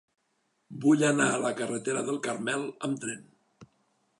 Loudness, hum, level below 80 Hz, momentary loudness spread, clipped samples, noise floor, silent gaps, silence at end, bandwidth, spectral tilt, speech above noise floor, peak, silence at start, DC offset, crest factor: -28 LUFS; none; -78 dBFS; 12 LU; under 0.1%; -75 dBFS; none; 0.55 s; 11.5 kHz; -4.5 dB/octave; 47 dB; -12 dBFS; 0.7 s; under 0.1%; 18 dB